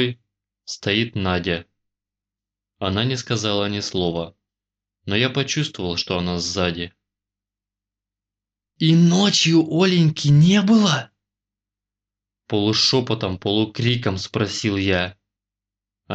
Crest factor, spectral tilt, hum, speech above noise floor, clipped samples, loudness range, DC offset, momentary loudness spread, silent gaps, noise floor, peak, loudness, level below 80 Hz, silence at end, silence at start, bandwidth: 16 dB; -5 dB/octave; 50 Hz at -45 dBFS; 69 dB; under 0.1%; 8 LU; under 0.1%; 11 LU; none; -88 dBFS; -6 dBFS; -20 LUFS; -54 dBFS; 0 s; 0 s; 8.4 kHz